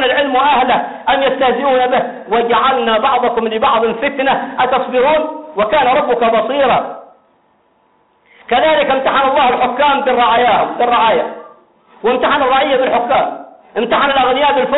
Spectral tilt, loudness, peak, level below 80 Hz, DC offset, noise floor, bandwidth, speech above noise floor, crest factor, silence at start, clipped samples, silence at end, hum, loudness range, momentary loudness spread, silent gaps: -1 dB/octave; -13 LUFS; -4 dBFS; -48 dBFS; under 0.1%; -55 dBFS; 4.1 kHz; 43 dB; 10 dB; 0 s; under 0.1%; 0 s; none; 3 LU; 6 LU; none